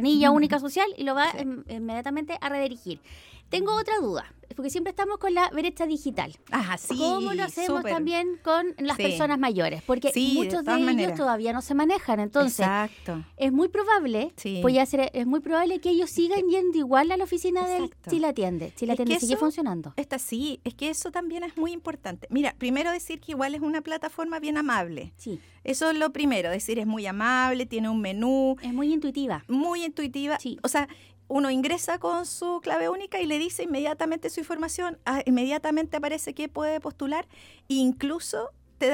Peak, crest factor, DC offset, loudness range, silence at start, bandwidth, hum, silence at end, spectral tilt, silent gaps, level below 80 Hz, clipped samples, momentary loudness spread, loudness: -6 dBFS; 20 dB; under 0.1%; 5 LU; 0 s; 17.5 kHz; none; 0 s; -4 dB/octave; none; -56 dBFS; under 0.1%; 9 LU; -27 LUFS